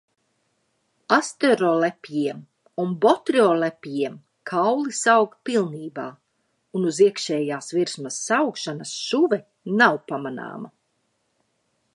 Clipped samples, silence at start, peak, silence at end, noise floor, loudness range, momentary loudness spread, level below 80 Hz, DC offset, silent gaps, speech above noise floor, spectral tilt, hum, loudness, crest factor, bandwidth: under 0.1%; 1.1 s; -2 dBFS; 1.25 s; -72 dBFS; 3 LU; 14 LU; -78 dBFS; under 0.1%; none; 50 dB; -4 dB/octave; none; -22 LUFS; 22 dB; 11.5 kHz